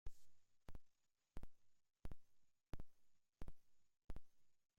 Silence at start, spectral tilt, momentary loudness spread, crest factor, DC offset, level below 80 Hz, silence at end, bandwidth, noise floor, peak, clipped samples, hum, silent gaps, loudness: 0.05 s; -6.5 dB/octave; 5 LU; 14 dB; under 0.1%; -62 dBFS; 0.25 s; 10 kHz; -77 dBFS; -38 dBFS; under 0.1%; none; none; -65 LUFS